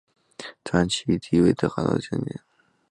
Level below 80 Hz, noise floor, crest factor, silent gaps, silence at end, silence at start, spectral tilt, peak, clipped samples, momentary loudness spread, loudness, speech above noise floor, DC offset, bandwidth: -48 dBFS; -43 dBFS; 20 dB; none; 0.55 s; 0.4 s; -6 dB/octave; -4 dBFS; under 0.1%; 19 LU; -23 LUFS; 20 dB; under 0.1%; 11 kHz